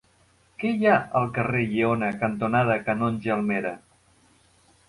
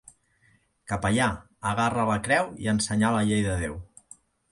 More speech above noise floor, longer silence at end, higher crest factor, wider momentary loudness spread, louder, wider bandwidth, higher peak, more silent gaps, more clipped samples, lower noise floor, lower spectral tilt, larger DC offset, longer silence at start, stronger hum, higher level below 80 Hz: about the same, 37 dB vs 40 dB; first, 1.1 s vs 0.65 s; about the same, 18 dB vs 18 dB; about the same, 8 LU vs 9 LU; about the same, -24 LUFS vs -26 LUFS; about the same, 11.5 kHz vs 11.5 kHz; first, -6 dBFS vs -10 dBFS; neither; neither; second, -61 dBFS vs -65 dBFS; first, -8 dB/octave vs -5 dB/octave; neither; second, 0.6 s vs 0.9 s; neither; second, -58 dBFS vs -46 dBFS